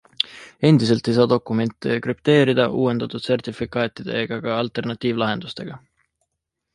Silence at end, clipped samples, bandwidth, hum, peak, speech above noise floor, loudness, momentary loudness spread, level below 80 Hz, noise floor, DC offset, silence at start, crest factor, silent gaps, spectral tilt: 0.95 s; under 0.1%; 11.5 kHz; none; -2 dBFS; 59 dB; -21 LUFS; 9 LU; -56 dBFS; -79 dBFS; under 0.1%; 0.2 s; 20 dB; none; -7 dB/octave